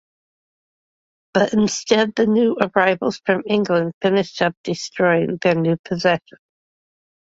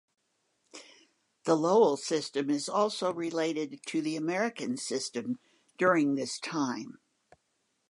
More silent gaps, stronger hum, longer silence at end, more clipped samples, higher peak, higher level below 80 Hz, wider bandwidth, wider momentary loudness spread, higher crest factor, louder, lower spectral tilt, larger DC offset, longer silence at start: first, 3.94-4.01 s, 4.57-4.64 s, 5.79-5.84 s vs none; neither; first, 1.2 s vs 1 s; neither; first, 0 dBFS vs -12 dBFS; first, -60 dBFS vs -84 dBFS; second, 8 kHz vs 11.5 kHz; second, 5 LU vs 13 LU; about the same, 20 dB vs 20 dB; first, -19 LUFS vs -30 LUFS; about the same, -5 dB/octave vs -4.5 dB/octave; neither; first, 1.35 s vs 0.75 s